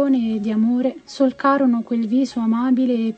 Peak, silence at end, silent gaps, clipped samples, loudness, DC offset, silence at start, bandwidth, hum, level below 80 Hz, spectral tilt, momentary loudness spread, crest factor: -4 dBFS; 0.05 s; none; under 0.1%; -19 LUFS; under 0.1%; 0 s; 8.4 kHz; none; -62 dBFS; -7 dB/octave; 4 LU; 14 dB